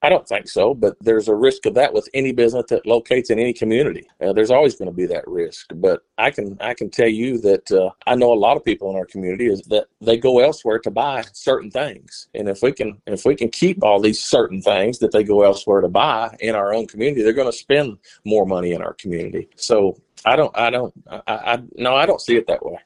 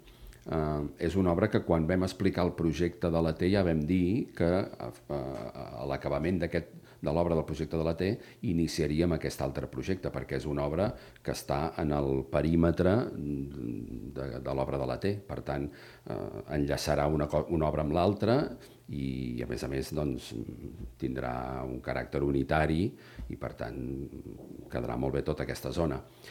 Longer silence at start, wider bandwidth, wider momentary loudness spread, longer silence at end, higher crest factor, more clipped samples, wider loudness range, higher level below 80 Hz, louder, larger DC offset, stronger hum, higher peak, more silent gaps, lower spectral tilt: about the same, 0 s vs 0.05 s; second, 11 kHz vs 16.5 kHz; about the same, 10 LU vs 12 LU; about the same, 0.05 s vs 0 s; about the same, 16 dB vs 20 dB; neither; second, 3 LU vs 6 LU; second, -52 dBFS vs -46 dBFS; first, -18 LUFS vs -32 LUFS; neither; neither; first, -2 dBFS vs -10 dBFS; neither; second, -5 dB/octave vs -7 dB/octave